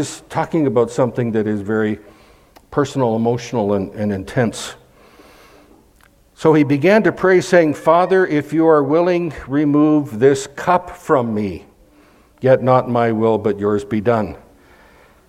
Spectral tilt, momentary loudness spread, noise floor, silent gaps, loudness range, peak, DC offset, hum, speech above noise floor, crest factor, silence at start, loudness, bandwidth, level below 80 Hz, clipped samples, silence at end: -6.5 dB/octave; 9 LU; -52 dBFS; none; 7 LU; 0 dBFS; under 0.1%; none; 36 dB; 16 dB; 0 s; -16 LUFS; 14.5 kHz; -50 dBFS; under 0.1%; 0.9 s